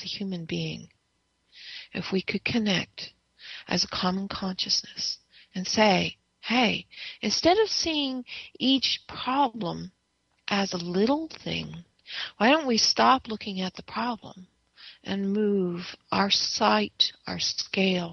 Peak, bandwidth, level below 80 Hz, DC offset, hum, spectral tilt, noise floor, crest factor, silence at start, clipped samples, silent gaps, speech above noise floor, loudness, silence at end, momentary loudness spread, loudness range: -6 dBFS; 7 kHz; -60 dBFS; under 0.1%; none; -4 dB/octave; -73 dBFS; 22 dB; 0 s; under 0.1%; none; 46 dB; -26 LUFS; 0 s; 17 LU; 5 LU